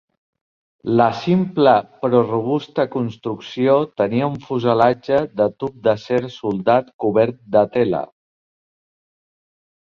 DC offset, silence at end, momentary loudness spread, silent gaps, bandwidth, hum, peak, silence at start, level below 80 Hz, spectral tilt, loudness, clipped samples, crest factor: under 0.1%; 1.85 s; 8 LU; 6.94-6.99 s; 7 kHz; none; -2 dBFS; 0.85 s; -58 dBFS; -8 dB/octave; -19 LUFS; under 0.1%; 18 dB